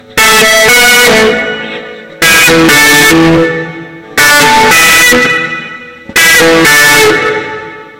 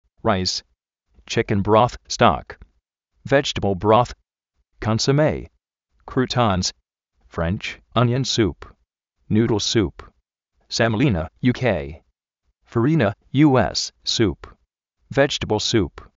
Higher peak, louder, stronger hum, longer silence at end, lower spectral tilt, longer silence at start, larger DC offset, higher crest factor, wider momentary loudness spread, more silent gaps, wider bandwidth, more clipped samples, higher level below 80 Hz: about the same, 0 dBFS vs 0 dBFS; first, -4 LUFS vs -20 LUFS; neither; second, 0.1 s vs 0.3 s; second, -2 dB/octave vs -4.5 dB/octave; second, 0.1 s vs 0.25 s; neither; second, 6 dB vs 20 dB; first, 17 LU vs 10 LU; neither; first, over 20 kHz vs 8 kHz; first, 0.6% vs under 0.1%; first, -34 dBFS vs -44 dBFS